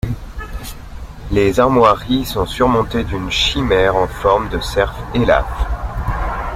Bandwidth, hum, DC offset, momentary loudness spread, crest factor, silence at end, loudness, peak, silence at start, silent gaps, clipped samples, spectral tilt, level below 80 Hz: 16.5 kHz; none; under 0.1%; 17 LU; 16 dB; 0 s; -16 LUFS; 0 dBFS; 0.05 s; none; under 0.1%; -5.5 dB/octave; -26 dBFS